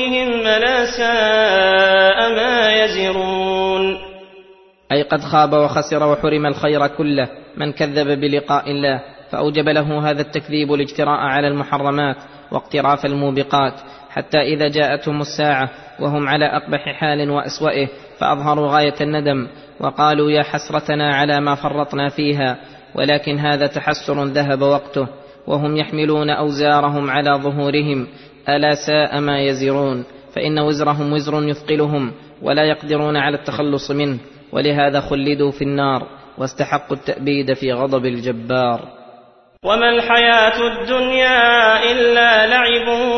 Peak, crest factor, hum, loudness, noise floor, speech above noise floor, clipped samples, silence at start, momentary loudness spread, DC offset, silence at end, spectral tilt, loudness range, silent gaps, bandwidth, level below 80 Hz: -2 dBFS; 16 dB; none; -16 LUFS; -47 dBFS; 30 dB; under 0.1%; 0 s; 11 LU; under 0.1%; 0 s; -5.5 dB/octave; 5 LU; none; 6.4 kHz; -50 dBFS